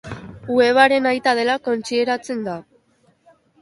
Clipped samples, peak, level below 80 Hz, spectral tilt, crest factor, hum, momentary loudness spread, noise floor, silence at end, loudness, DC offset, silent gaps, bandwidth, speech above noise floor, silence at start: under 0.1%; 0 dBFS; -56 dBFS; -4 dB/octave; 20 dB; none; 18 LU; -60 dBFS; 1 s; -18 LUFS; under 0.1%; none; 11.5 kHz; 42 dB; 0.05 s